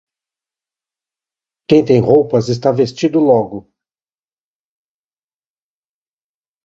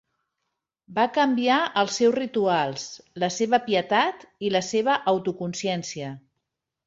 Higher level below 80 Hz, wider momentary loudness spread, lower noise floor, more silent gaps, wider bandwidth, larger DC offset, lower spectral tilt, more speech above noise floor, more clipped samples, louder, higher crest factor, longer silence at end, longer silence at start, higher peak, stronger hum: first, -54 dBFS vs -70 dBFS; second, 5 LU vs 10 LU; first, under -90 dBFS vs -82 dBFS; neither; about the same, 7.8 kHz vs 8 kHz; neither; first, -7.5 dB/octave vs -4 dB/octave; first, over 78 dB vs 58 dB; neither; first, -13 LUFS vs -24 LUFS; about the same, 18 dB vs 18 dB; first, 3.05 s vs 0.7 s; first, 1.7 s vs 0.9 s; first, 0 dBFS vs -8 dBFS; neither